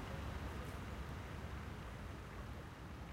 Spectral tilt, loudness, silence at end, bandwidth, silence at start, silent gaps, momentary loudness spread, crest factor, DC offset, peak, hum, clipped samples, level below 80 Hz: -6 dB/octave; -49 LUFS; 0 s; 16 kHz; 0 s; none; 4 LU; 14 dB; under 0.1%; -34 dBFS; none; under 0.1%; -52 dBFS